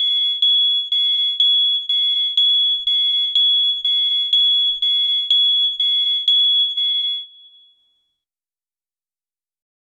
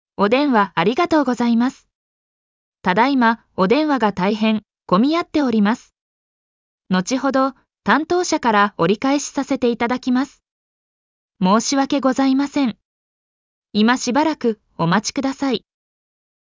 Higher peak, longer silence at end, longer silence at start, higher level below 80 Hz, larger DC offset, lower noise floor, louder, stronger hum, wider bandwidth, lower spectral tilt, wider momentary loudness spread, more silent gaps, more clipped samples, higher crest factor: about the same, -6 dBFS vs -4 dBFS; first, 2.75 s vs 0.85 s; second, 0 s vs 0.2 s; second, -66 dBFS vs -58 dBFS; neither; about the same, under -90 dBFS vs under -90 dBFS; first, -14 LUFS vs -18 LUFS; neither; first, 10.5 kHz vs 7.6 kHz; second, 4 dB/octave vs -5 dB/octave; second, 3 LU vs 7 LU; second, none vs 1.95-2.72 s, 6.01-6.78 s, 10.51-11.29 s, 12.85-13.62 s; neither; about the same, 12 dB vs 16 dB